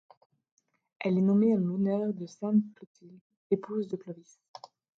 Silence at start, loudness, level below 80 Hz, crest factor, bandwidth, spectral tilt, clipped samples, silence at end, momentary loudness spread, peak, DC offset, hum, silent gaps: 1 s; -29 LUFS; -78 dBFS; 16 dB; 6.8 kHz; -9 dB/octave; under 0.1%; 0.8 s; 23 LU; -14 dBFS; under 0.1%; none; 2.87-2.95 s, 3.21-3.30 s, 3.37-3.50 s